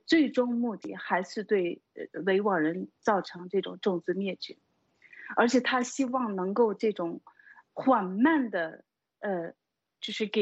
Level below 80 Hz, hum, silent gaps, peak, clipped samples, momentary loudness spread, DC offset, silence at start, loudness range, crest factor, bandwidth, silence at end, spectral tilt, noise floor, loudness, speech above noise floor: -78 dBFS; none; none; -10 dBFS; under 0.1%; 14 LU; under 0.1%; 0.1 s; 2 LU; 18 dB; 8.2 kHz; 0 s; -5 dB/octave; -60 dBFS; -29 LUFS; 32 dB